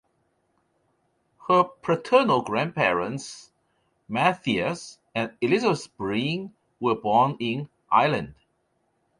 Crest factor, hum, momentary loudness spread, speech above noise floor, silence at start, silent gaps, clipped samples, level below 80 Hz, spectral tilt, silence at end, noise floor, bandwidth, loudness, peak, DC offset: 20 dB; none; 13 LU; 48 dB; 1.45 s; none; under 0.1%; -62 dBFS; -5.5 dB/octave; 0.85 s; -71 dBFS; 11 kHz; -24 LUFS; -6 dBFS; under 0.1%